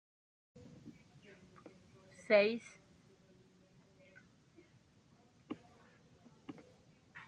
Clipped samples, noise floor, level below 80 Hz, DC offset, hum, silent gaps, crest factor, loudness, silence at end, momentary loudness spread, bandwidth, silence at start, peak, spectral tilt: under 0.1%; -68 dBFS; -82 dBFS; under 0.1%; none; none; 28 dB; -35 LUFS; 0.1 s; 31 LU; 9 kHz; 0.85 s; -16 dBFS; -5 dB/octave